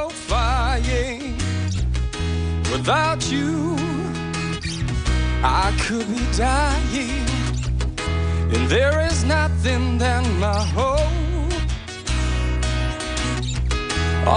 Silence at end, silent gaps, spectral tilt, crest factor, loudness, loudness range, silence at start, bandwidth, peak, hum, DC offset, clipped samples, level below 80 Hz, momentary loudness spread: 0 s; none; -5 dB/octave; 16 dB; -22 LUFS; 3 LU; 0 s; 10 kHz; -4 dBFS; none; under 0.1%; under 0.1%; -26 dBFS; 6 LU